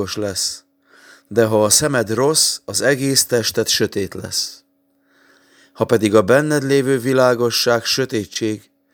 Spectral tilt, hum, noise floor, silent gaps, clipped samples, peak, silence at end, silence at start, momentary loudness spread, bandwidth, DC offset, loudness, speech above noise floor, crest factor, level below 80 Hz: -3 dB/octave; none; -62 dBFS; none; under 0.1%; 0 dBFS; 0.35 s; 0 s; 9 LU; over 20 kHz; under 0.1%; -17 LUFS; 45 dB; 18 dB; -58 dBFS